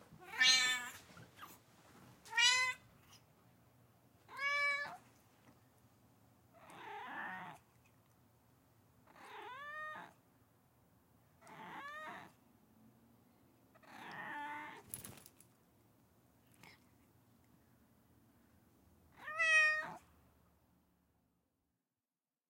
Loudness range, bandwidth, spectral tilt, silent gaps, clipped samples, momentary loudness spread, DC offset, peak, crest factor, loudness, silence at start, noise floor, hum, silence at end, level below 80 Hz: 18 LU; 16.5 kHz; 0.5 dB/octave; none; under 0.1%; 27 LU; under 0.1%; -16 dBFS; 28 dB; -35 LUFS; 0.1 s; under -90 dBFS; none; 2.5 s; -84 dBFS